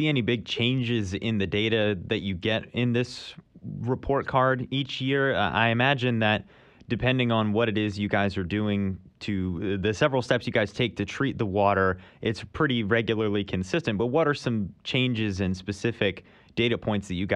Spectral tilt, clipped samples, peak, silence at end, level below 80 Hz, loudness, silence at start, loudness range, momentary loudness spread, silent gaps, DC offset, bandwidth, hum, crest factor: -6.5 dB/octave; under 0.1%; -8 dBFS; 0 s; -52 dBFS; -26 LUFS; 0 s; 3 LU; 7 LU; none; under 0.1%; 9.8 kHz; none; 18 dB